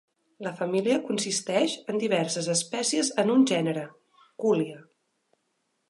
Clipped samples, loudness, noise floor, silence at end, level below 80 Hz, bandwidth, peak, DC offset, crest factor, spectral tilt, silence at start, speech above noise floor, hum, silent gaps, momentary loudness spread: under 0.1%; -26 LUFS; -76 dBFS; 1.05 s; -80 dBFS; 11.5 kHz; -10 dBFS; under 0.1%; 18 dB; -4 dB/octave; 0.4 s; 50 dB; none; none; 12 LU